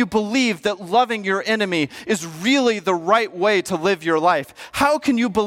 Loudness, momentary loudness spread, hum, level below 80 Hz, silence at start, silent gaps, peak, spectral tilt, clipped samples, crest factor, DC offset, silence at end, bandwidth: -19 LUFS; 5 LU; none; -56 dBFS; 0 s; none; -4 dBFS; -4 dB/octave; under 0.1%; 16 dB; under 0.1%; 0 s; 16.5 kHz